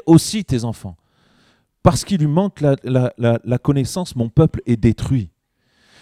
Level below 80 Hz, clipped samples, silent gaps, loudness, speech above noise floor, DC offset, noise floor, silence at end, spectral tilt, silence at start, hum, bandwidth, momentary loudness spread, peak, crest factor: -38 dBFS; under 0.1%; none; -18 LUFS; 47 dB; under 0.1%; -63 dBFS; 0.75 s; -7 dB/octave; 0.05 s; none; 15 kHz; 7 LU; 0 dBFS; 18 dB